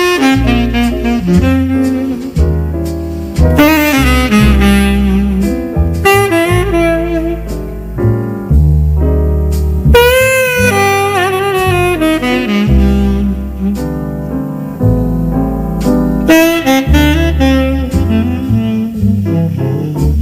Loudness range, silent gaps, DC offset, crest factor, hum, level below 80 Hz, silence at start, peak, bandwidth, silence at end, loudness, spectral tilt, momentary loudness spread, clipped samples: 3 LU; none; under 0.1%; 10 dB; none; -16 dBFS; 0 s; 0 dBFS; 16.5 kHz; 0 s; -11 LUFS; -6 dB/octave; 9 LU; under 0.1%